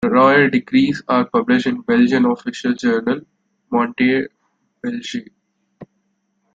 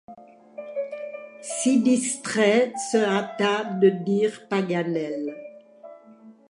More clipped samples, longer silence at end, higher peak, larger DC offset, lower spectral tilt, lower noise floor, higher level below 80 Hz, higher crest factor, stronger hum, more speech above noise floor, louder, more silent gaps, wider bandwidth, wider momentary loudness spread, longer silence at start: neither; first, 0.7 s vs 0.15 s; first, -2 dBFS vs -8 dBFS; neither; first, -6 dB/octave vs -4.5 dB/octave; first, -68 dBFS vs -50 dBFS; first, -58 dBFS vs -78 dBFS; about the same, 16 dB vs 18 dB; neither; first, 51 dB vs 27 dB; first, -17 LUFS vs -23 LUFS; neither; second, 7.6 kHz vs 11.5 kHz; second, 14 LU vs 17 LU; about the same, 0 s vs 0.1 s